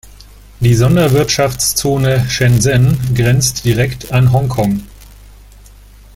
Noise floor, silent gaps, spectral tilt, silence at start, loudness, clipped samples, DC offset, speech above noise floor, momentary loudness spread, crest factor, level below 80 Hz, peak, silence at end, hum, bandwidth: -39 dBFS; none; -5 dB/octave; 0.6 s; -13 LUFS; under 0.1%; under 0.1%; 27 dB; 5 LU; 14 dB; -34 dBFS; 0 dBFS; 1.2 s; none; 16.5 kHz